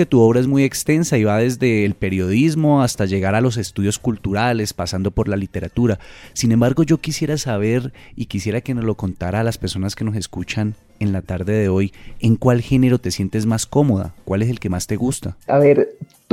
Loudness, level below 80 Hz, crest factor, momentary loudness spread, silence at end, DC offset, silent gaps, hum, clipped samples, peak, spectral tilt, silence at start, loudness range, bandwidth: -19 LUFS; -42 dBFS; 14 dB; 8 LU; 0.3 s; under 0.1%; none; none; under 0.1%; -2 dBFS; -6 dB/octave; 0 s; 5 LU; 16 kHz